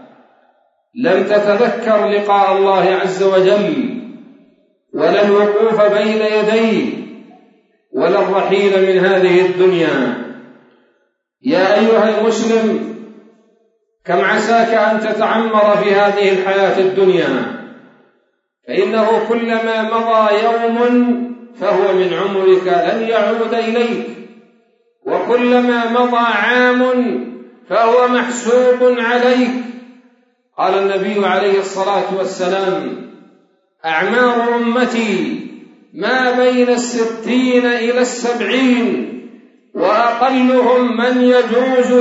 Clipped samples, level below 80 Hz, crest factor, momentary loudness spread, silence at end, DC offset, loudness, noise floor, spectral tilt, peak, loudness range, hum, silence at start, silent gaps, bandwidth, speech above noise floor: under 0.1%; -74 dBFS; 14 dB; 11 LU; 0 s; under 0.1%; -14 LUFS; -63 dBFS; -5 dB/octave; -2 dBFS; 3 LU; none; 0.95 s; none; 8 kHz; 50 dB